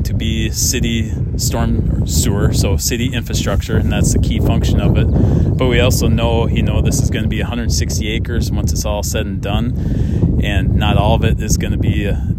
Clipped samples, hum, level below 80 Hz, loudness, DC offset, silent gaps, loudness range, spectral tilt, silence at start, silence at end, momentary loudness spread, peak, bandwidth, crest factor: under 0.1%; none; -20 dBFS; -16 LUFS; under 0.1%; none; 3 LU; -5.5 dB/octave; 0 s; 0 s; 5 LU; 0 dBFS; 16.5 kHz; 14 dB